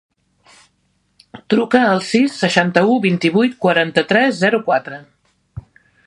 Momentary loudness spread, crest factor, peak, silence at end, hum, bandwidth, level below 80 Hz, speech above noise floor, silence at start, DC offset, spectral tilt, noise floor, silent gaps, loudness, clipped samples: 5 LU; 18 dB; 0 dBFS; 0.45 s; none; 11 kHz; -56 dBFS; 48 dB; 1.35 s; under 0.1%; -5.5 dB/octave; -63 dBFS; none; -15 LUFS; under 0.1%